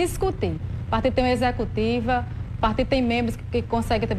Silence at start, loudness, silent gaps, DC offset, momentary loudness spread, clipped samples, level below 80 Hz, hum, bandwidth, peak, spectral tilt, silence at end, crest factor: 0 s; -24 LUFS; none; under 0.1%; 6 LU; under 0.1%; -34 dBFS; none; 14 kHz; -10 dBFS; -6.5 dB/octave; 0 s; 14 dB